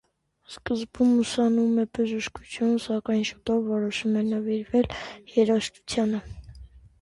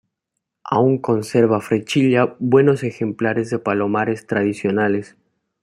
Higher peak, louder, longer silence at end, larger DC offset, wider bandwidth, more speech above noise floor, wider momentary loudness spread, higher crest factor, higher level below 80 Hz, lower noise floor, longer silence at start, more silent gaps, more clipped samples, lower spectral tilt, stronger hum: second, -10 dBFS vs -2 dBFS; second, -26 LUFS vs -19 LUFS; second, 0.25 s vs 0.6 s; neither; second, 11.5 kHz vs 13 kHz; second, 23 dB vs 61 dB; first, 11 LU vs 6 LU; about the same, 16 dB vs 16 dB; first, -52 dBFS vs -62 dBFS; second, -48 dBFS vs -79 dBFS; second, 0.5 s vs 0.65 s; neither; neither; second, -5.5 dB/octave vs -7 dB/octave; neither